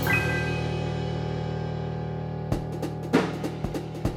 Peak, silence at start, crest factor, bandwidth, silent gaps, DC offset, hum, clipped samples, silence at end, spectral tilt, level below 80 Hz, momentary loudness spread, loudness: -8 dBFS; 0 s; 20 dB; 16 kHz; none; under 0.1%; none; under 0.1%; 0 s; -6.5 dB/octave; -42 dBFS; 7 LU; -29 LUFS